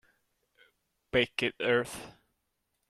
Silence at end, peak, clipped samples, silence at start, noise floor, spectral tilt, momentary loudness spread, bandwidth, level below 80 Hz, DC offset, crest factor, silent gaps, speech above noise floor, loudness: 0.8 s; -12 dBFS; under 0.1%; 1.15 s; -80 dBFS; -4 dB/octave; 16 LU; 14 kHz; -62 dBFS; under 0.1%; 24 dB; none; 50 dB; -30 LUFS